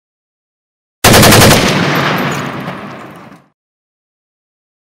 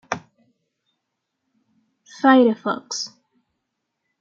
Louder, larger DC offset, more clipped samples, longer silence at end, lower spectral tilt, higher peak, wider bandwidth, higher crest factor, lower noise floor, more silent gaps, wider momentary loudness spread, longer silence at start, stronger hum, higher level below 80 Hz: first, -8 LUFS vs -19 LUFS; neither; first, 0.3% vs under 0.1%; first, 1.7 s vs 1.15 s; about the same, -3.5 dB/octave vs -4 dB/octave; about the same, 0 dBFS vs -2 dBFS; first, over 20 kHz vs 7.4 kHz; second, 12 dB vs 22 dB; second, -34 dBFS vs -78 dBFS; neither; first, 20 LU vs 17 LU; first, 1.05 s vs 0.1 s; neither; first, -30 dBFS vs -74 dBFS